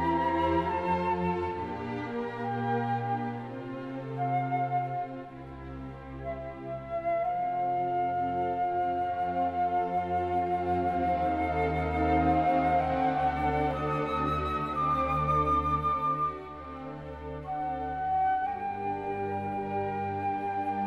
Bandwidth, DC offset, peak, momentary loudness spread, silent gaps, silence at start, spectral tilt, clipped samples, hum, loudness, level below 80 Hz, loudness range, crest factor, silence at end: 7.6 kHz; under 0.1%; -16 dBFS; 12 LU; none; 0 s; -8.5 dB/octave; under 0.1%; none; -30 LUFS; -46 dBFS; 6 LU; 14 dB; 0 s